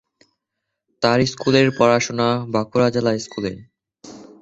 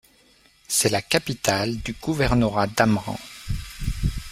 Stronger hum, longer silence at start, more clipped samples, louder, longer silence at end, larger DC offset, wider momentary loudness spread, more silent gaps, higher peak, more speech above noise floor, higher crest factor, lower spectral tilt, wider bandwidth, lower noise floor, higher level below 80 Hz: neither; first, 1 s vs 0.7 s; neither; first, -19 LUFS vs -23 LUFS; first, 0.2 s vs 0 s; neither; about the same, 12 LU vs 12 LU; neither; about the same, -2 dBFS vs -2 dBFS; first, 61 dB vs 35 dB; about the same, 18 dB vs 22 dB; about the same, -5 dB/octave vs -4 dB/octave; second, 8 kHz vs 16 kHz; first, -80 dBFS vs -57 dBFS; second, -54 dBFS vs -36 dBFS